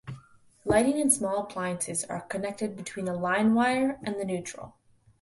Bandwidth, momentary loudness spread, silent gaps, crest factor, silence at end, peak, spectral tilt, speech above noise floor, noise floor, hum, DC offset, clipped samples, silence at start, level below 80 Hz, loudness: 12 kHz; 17 LU; none; 20 dB; 0.5 s; -8 dBFS; -4 dB/octave; 28 dB; -56 dBFS; none; under 0.1%; under 0.1%; 0.05 s; -58 dBFS; -28 LUFS